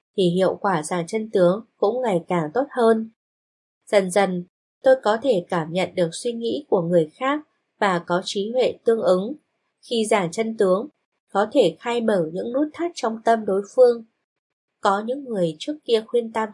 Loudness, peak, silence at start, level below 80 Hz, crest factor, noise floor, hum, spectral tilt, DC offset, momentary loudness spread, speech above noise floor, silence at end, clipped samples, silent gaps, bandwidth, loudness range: -22 LUFS; -4 dBFS; 0.15 s; -76 dBFS; 18 dB; under -90 dBFS; none; -5.5 dB/octave; under 0.1%; 7 LU; over 69 dB; 0 s; under 0.1%; 3.16-3.81 s, 4.49-4.81 s, 11.05-11.12 s, 11.20-11.27 s, 14.24-14.68 s; 11.5 kHz; 1 LU